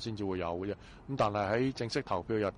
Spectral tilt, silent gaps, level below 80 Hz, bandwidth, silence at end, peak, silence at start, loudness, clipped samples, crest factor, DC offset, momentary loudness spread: -6 dB/octave; none; -58 dBFS; 11 kHz; 0 s; -20 dBFS; 0 s; -34 LUFS; under 0.1%; 14 dB; under 0.1%; 9 LU